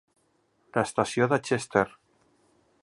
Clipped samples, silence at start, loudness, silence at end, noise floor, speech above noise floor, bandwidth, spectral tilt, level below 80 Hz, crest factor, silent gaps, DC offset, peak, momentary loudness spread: under 0.1%; 0.75 s; -27 LUFS; 0.95 s; -69 dBFS; 44 dB; 11.5 kHz; -5 dB/octave; -64 dBFS; 24 dB; none; under 0.1%; -6 dBFS; 6 LU